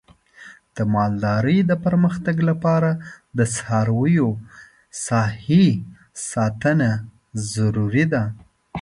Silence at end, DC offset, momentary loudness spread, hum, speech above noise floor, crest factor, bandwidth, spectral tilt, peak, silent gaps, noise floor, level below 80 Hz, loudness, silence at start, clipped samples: 0 s; under 0.1%; 12 LU; none; 26 dB; 16 dB; 11.5 kHz; -6.5 dB/octave; -4 dBFS; none; -46 dBFS; -50 dBFS; -20 LUFS; 0.4 s; under 0.1%